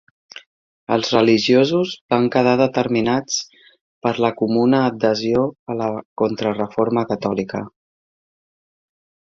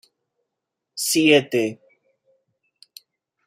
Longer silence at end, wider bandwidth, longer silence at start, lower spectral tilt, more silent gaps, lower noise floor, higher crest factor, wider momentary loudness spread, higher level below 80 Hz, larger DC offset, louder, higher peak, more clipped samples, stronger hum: about the same, 1.65 s vs 1.75 s; second, 7.6 kHz vs 16 kHz; second, 0.35 s vs 0.95 s; first, -5 dB/octave vs -3 dB/octave; first, 0.46-0.87 s, 2.01-2.09 s, 3.81-4.01 s, 5.59-5.66 s, 6.05-6.16 s vs none; first, under -90 dBFS vs -82 dBFS; about the same, 18 dB vs 22 dB; second, 10 LU vs 13 LU; first, -58 dBFS vs -72 dBFS; neither; about the same, -19 LUFS vs -19 LUFS; about the same, -2 dBFS vs -2 dBFS; neither; neither